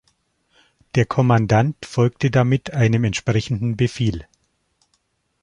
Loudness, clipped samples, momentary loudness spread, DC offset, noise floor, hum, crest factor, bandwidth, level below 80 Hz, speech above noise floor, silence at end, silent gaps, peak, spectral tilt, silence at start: -19 LUFS; under 0.1%; 7 LU; under 0.1%; -68 dBFS; none; 18 dB; 9.8 kHz; -46 dBFS; 50 dB; 1.2 s; none; -2 dBFS; -7 dB/octave; 0.95 s